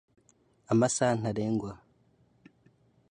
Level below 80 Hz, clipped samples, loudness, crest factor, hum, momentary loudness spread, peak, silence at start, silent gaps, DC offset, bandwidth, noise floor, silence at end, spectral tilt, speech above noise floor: -64 dBFS; under 0.1%; -29 LUFS; 20 dB; none; 15 LU; -12 dBFS; 0.7 s; none; under 0.1%; 11 kHz; -66 dBFS; 1.35 s; -5.5 dB/octave; 39 dB